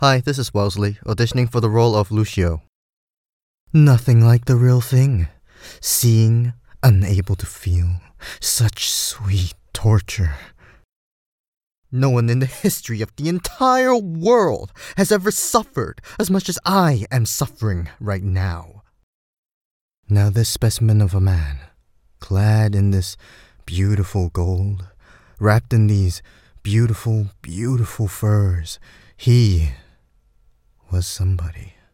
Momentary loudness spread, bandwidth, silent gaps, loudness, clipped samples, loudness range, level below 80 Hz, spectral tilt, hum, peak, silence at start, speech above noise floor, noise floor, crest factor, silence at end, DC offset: 12 LU; 17 kHz; 2.69-3.67 s, 10.85-11.71 s, 11.77-11.82 s, 19.03-19.89 s, 19.97-20.03 s; -18 LUFS; under 0.1%; 5 LU; -38 dBFS; -5.5 dB/octave; none; 0 dBFS; 0 s; 40 dB; -57 dBFS; 18 dB; 0.25 s; under 0.1%